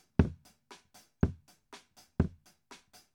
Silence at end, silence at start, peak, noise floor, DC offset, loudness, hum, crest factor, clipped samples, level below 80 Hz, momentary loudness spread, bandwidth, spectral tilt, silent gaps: 0.4 s; 0.2 s; -8 dBFS; -60 dBFS; under 0.1%; -34 LUFS; none; 28 dB; under 0.1%; -46 dBFS; 24 LU; 15.5 kHz; -8 dB/octave; none